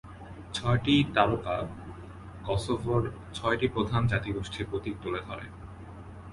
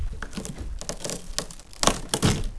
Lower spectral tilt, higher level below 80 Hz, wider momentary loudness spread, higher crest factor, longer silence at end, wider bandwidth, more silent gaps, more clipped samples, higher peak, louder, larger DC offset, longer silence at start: first, -6.5 dB/octave vs -3.5 dB/octave; second, -46 dBFS vs -34 dBFS; first, 21 LU vs 12 LU; about the same, 24 dB vs 28 dB; about the same, 0 s vs 0 s; about the same, 11.5 kHz vs 11 kHz; neither; neither; second, -6 dBFS vs 0 dBFS; about the same, -29 LUFS vs -28 LUFS; second, under 0.1% vs 0.5%; about the same, 0.05 s vs 0 s